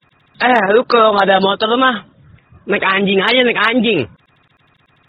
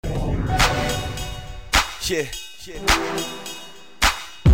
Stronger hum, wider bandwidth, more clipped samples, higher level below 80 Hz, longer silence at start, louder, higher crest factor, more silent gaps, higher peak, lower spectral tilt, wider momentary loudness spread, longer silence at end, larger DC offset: neither; second, 7.8 kHz vs 16.5 kHz; neither; second, -56 dBFS vs -30 dBFS; first, 0.4 s vs 0 s; first, -13 LUFS vs -22 LUFS; about the same, 14 dB vs 16 dB; neither; first, 0 dBFS vs -6 dBFS; first, -6.5 dB/octave vs -3.5 dB/octave; second, 8 LU vs 15 LU; first, 1 s vs 0 s; second, under 0.1% vs 0.8%